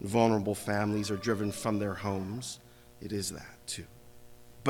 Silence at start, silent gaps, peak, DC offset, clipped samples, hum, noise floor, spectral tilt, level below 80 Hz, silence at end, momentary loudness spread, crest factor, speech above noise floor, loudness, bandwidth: 0 s; none; -10 dBFS; under 0.1%; under 0.1%; 60 Hz at -60 dBFS; -51 dBFS; -5 dB/octave; -62 dBFS; 0 s; 15 LU; 22 dB; 20 dB; -33 LUFS; 19.5 kHz